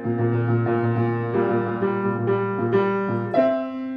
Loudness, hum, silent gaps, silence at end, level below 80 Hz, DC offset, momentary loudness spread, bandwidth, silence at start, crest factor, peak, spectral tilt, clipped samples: -22 LUFS; none; none; 0 s; -64 dBFS; under 0.1%; 3 LU; 5 kHz; 0 s; 16 dB; -6 dBFS; -10.5 dB/octave; under 0.1%